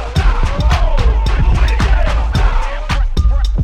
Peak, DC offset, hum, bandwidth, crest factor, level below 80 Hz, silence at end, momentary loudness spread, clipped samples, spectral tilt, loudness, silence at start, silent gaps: 0 dBFS; under 0.1%; none; 9.6 kHz; 10 dB; -12 dBFS; 0 s; 4 LU; under 0.1%; -6 dB/octave; -16 LUFS; 0 s; none